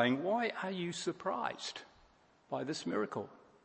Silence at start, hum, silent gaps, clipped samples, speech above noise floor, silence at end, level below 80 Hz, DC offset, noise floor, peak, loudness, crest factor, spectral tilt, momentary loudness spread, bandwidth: 0 s; none; none; under 0.1%; 30 dB; 0.25 s; -78 dBFS; under 0.1%; -67 dBFS; -16 dBFS; -38 LUFS; 22 dB; -4.5 dB/octave; 10 LU; 8.4 kHz